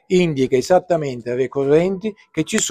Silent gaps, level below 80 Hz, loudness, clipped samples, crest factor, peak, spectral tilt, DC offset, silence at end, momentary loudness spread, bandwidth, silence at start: none; -52 dBFS; -19 LUFS; under 0.1%; 18 dB; 0 dBFS; -5 dB/octave; under 0.1%; 0 s; 9 LU; 15 kHz; 0.1 s